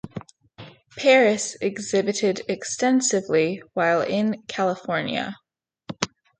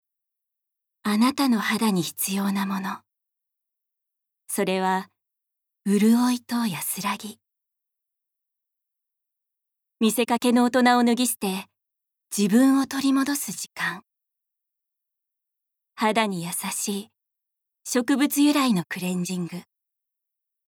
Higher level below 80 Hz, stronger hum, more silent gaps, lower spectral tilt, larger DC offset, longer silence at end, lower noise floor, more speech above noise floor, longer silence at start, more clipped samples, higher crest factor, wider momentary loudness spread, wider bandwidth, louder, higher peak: first, -64 dBFS vs -76 dBFS; neither; neither; about the same, -3.5 dB/octave vs -4 dB/octave; neither; second, 0.35 s vs 1.05 s; second, -46 dBFS vs -84 dBFS; second, 24 dB vs 62 dB; second, 0.05 s vs 1.05 s; neither; about the same, 22 dB vs 20 dB; about the same, 12 LU vs 13 LU; second, 9.6 kHz vs 19.5 kHz; about the same, -22 LUFS vs -23 LUFS; first, -2 dBFS vs -6 dBFS